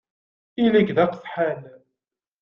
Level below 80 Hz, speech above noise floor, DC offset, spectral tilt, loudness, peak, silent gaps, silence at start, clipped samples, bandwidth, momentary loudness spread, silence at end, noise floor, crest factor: -62 dBFS; 65 dB; under 0.1%; -8.5 dB/octave; -21 LUFS; -6 dBFS; none; 0.6 s; under 0.1%; 5.8 kHz; 14 LU; 0.7 s; -86 dBFS; 18 dB